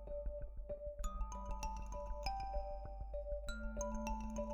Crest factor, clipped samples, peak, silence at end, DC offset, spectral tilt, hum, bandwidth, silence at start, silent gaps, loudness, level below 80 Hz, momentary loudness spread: 16 dB; under 0.1%; -28 dBFS; 0 s; under 0.1%; -5.5 dB/octave; none; 13.5 kHz; 0 s; none; -46 LUFS; -46 dBFS; 6 LU